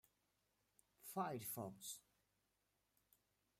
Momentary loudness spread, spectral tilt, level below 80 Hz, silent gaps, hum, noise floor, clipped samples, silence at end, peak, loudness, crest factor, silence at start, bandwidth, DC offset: 10 LU; -4 dB/octave; -88 dBFS; none; none; -86 dBFS; under 0.1%; 1.6 s; -32 dBFS; -49 LUFS; 22 dB; 1 s; 16 kHz; under 0.1%